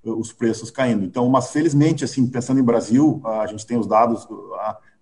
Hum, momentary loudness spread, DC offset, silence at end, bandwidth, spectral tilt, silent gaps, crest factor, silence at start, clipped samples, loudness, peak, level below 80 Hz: none; 11 LU; 0.2%; 0.25 s; 11 kHz; -6.5 dB/octave; none; 16 dB; 0.05 s; under 0.1%; -20 LUFS; -2 dBFS; -60 dBFS